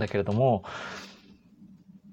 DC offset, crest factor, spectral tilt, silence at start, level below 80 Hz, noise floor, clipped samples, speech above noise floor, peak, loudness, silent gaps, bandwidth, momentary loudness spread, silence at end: under 0.1%; 18 dB; -7.5 dB/octave; 0 s; -62 dBFS; -55 dBFS; under 0.1%; 27 dB; -12 dBFS; -28 LUFS; none; 8.4 kHz; 18 LU; 0 s